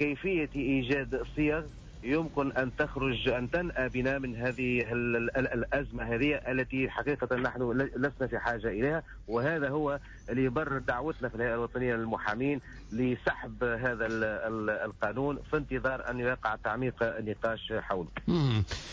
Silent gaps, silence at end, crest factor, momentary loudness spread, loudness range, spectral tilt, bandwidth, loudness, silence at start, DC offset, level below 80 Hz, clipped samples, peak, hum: none; 0 s; 12 dB; 4 LU; 2 LU; -7 dB/octave; 7.6 kHz; -32 LUFS; 0 s; under 0.1%; -48 dBFS; under 0.1%; -18 dBFS; none